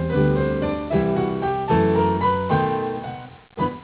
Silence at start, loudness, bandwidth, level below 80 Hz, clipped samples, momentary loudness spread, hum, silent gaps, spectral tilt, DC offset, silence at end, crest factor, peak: 0 s; -21 LUFS; 4 kHz; -38 dBFS; under 0.1%; 11 LU; none; none; -12 dB/octave; under 0.1%; 0 s; 14 dB; -6 dBFS